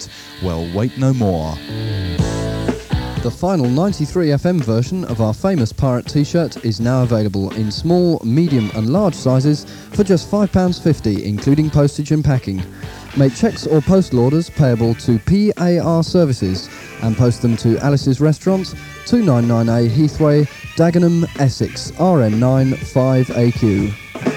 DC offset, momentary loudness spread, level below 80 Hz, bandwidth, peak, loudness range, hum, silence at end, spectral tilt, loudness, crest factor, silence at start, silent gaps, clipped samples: under 0.1%; 8 LU; -36 dBFS; 16 kHz; 0 dBFS; 3 LU; none; 0 s; -7.5 dB/octave; -16 LUFS; 16 dB; 0 s; none; under 0.1%